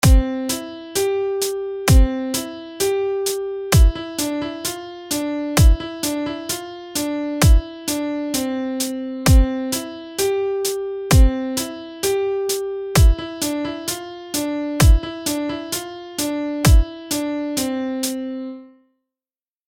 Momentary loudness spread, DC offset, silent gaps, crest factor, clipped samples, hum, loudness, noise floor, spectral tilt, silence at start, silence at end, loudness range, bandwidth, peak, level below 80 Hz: 11 LU; under 0.1%; none; 18 dB; under 0.1%; none; -20 LUFS; under -90 dBFS; -5 dB/octave; 0.05 s; 1 s; 2 LU; 17 kHz; -2 dBFS; -22 dBFS